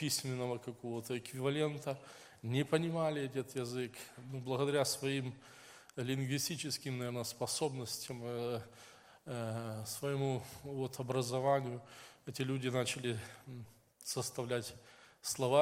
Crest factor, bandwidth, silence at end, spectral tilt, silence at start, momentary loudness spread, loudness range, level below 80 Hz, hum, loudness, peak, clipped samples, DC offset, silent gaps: 22 dB; 16.5 kHz; 0 s; -4.5 dB/octave; 0 s; 16 LU; 3 LU; -76 dBFS; none; -38 LUFS; -16 dBFS; under 0.1%; under 0.1%; none